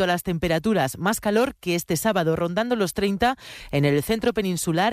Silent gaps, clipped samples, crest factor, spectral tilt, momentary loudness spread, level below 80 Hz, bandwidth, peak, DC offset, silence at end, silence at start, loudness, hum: none; under 0.1%; 16 dB; -5 dB/octave; 3 LU; -48 dBFS; 15.5 kHz; -6 dBFS; under 0.1%; 0 s; 0 s; -23 LUFS; none